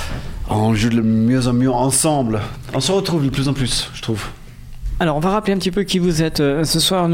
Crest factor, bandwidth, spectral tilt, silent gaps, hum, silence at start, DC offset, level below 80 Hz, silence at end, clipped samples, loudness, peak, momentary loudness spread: 14 dB; 16.5 kHz; -5 dB/octave; none; none; 0 s; under 0.1%; -32 dBFS; 0 s; under 0.1%; -18 LUFS; -4 dBFS; 9 LU